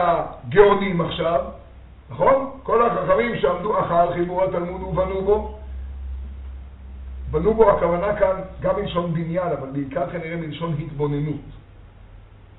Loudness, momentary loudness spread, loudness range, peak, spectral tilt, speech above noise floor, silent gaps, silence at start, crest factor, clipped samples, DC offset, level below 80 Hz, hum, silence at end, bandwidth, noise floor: -21 LUFS; 19 LU; 6 LU; 0 dBFS; -5.5 dB/octave; 24 dB; none; 0 s; 22 dB; under 0.1%; under 0.1%; -38 dBFS; none; 0.15 s; 4.1 kHz; -44 dBFS